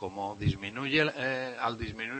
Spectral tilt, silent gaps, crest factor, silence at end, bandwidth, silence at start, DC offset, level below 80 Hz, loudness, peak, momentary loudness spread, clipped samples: -6 dB/octave; none; 20 dB; 0 s; 8.8 kHz; 0 s; under 0.1%; -52 dBFS; -31 LUFS; -12 dBFS; 8 LU; under 0.1%